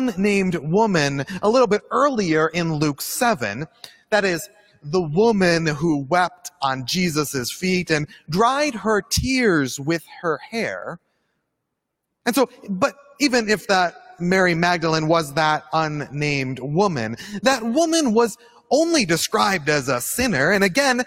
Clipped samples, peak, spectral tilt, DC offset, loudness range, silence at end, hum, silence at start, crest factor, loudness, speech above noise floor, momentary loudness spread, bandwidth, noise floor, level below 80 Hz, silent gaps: under 0.1%; -4 dBFS; -4.5 dB/octave; under 0.1%; 4 LU; 0 s; none; 0 s; 18 dB; -20 LUFS; 58 dB; 8 LU; 16.5 kHz; -78 dBFS; -50 dBFS; none